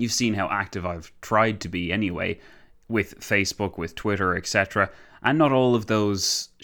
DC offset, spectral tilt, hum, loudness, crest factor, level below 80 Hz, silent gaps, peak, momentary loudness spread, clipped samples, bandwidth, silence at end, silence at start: under 0.1%; -4 dB/octave; none; -24 LUFS; 20 dB; -52 dBFS; none; -6 dBFS; 9 LU; under 0.1%; 19.5 kHz; 0.15 s; 0 s